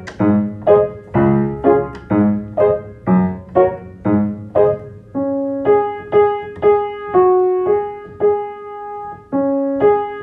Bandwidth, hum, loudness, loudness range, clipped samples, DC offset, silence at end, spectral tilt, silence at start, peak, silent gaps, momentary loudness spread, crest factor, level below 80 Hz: 5.2 kHz; none; -16 LUFS; 2 LU; under 0.1%; under 0.1%; 0 s; -10 dB/octave; 0 s; 0 dBFS; none; 10 LU; 16 dB; -46 dBFS